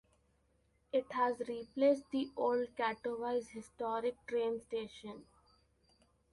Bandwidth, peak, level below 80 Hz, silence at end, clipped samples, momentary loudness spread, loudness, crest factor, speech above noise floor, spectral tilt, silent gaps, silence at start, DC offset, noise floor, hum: 11.5 kHz; -20 dBFS; -74 dBFS; 1.1 s; under 0.1%; 13 LU; -37 LUFS; 18 dB; 38 dB; -5 dB/octave; none; 0.95 s; under 0.1%; -75 dBFS; none